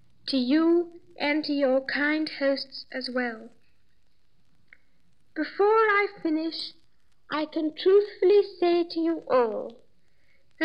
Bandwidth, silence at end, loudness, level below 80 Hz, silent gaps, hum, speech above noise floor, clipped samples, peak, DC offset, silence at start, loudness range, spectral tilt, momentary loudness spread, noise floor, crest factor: 9.8 kHz; 0 s; -25 LUFS; -74 dBFS; none; none; 46 dB; under 0.1%; -10 dBFS; 0.2%; 0.25 s; 6 LU; -5 dB/octave; 13 LU; -71 dBFS; 16 dB